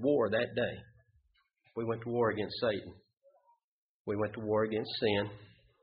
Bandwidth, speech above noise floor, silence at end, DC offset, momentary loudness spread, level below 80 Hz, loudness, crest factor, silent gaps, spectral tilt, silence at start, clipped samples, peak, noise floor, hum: 5 kHz; 40 dB; 0.35 s; under 0.1%; 14 LU; -66 dBFS; -34 LUFS; 18 dB; 3.17-3.21 s, 3.64-4.05 s; -4 dB/octave; 0 s; under 0.1%; -18 dBFS; -73 dBFS; none